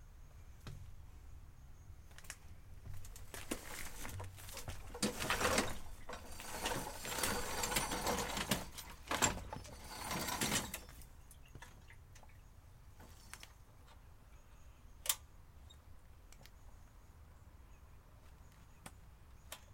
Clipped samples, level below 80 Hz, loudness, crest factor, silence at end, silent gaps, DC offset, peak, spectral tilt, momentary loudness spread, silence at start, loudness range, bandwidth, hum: under 0.1%; -54 dBFS; -40 LUFS; 30 dB; 0 s; none; under 0.1%; -16 dBFS; -2.5 dB/octave; 25 LU; 0 s; 21 LU; 16.5 kHz; none